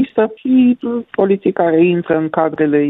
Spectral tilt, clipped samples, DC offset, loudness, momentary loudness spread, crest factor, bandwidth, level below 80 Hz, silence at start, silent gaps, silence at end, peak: -11 dB/octave; under 0.1%; under 0.1%; -15 LUFS; 5 LU; 12 dB; 4 kHz; -56 dBFS; 0 s; none; 0 s; -2 dBFS